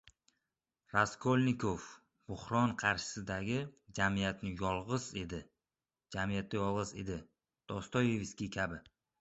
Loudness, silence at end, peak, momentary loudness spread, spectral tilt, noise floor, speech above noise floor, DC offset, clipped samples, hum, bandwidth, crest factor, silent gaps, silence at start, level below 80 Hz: -36 LUFS; 0.4 s; -14 dBFS; 13 LU; -5 dB/octave; under -90 dBFS; over 54 dB; under 0.1%; under 0.1%; none; 8 kHz; 24 dB; none; 0.95 s; -58 dBFS